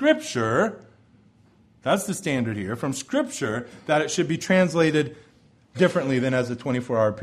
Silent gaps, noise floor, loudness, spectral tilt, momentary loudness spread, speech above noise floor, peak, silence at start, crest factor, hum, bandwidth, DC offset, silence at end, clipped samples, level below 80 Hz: none; -57 dBFS; -24 LUFS; -5 dB/octave; 8 LU; 34 dB; -6 dBFS; 0 s; 18 dB; none; 14.5 kHz; under 0.1%; 0 s; under 0.1%; -62 dBFS